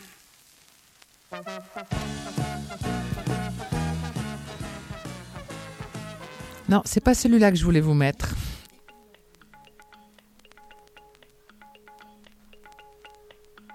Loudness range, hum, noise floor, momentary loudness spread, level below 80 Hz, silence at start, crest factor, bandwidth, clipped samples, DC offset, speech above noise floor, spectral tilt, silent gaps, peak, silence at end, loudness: 11 LU; none; -57 dBFS; 20 LU; -42 dBFS; 0 s; 24 dB; 16 kHz; under 0.1%; under 0.1%; 34 dB; -6 dB/octave; none; -4 dBFS; 0 s; -26 LUFS